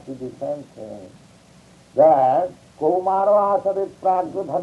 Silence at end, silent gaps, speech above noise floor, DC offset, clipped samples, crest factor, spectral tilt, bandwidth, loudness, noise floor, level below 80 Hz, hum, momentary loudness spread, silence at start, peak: 0 s; none; 30 dB; under 0.1%; under 0.1%; 16 dB; -7.5 dB/octave; 11 kHz; -20 LUFS; -50 dBFS; -62 dBFS; none; 20 LU; 0.05 s; -4 dBFS